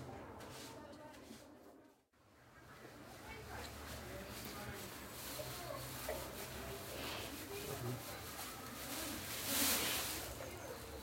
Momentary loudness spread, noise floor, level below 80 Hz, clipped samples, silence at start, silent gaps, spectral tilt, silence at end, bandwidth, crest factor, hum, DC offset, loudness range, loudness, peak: 18 LU; -69 dBFS; -62 dBFS; under 0.1%; 0 s; none; -2.5 dB/octave; 0 s; 16.5 kHz; 24 dB; none; under 0.1%; 14 LU; -44 LUFS; -22 dBFS